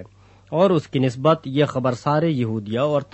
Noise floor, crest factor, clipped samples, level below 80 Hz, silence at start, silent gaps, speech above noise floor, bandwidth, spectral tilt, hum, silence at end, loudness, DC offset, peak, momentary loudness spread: -46 dBFS; 18 dB; under 0.1%; -58 dBFS; 0 s; none; 27 dB; 8.4 kHz; -7.5 dB/octave; none; 0.1 s; -21 LUFS; under 0.1%; -4 dBFS; 5 LU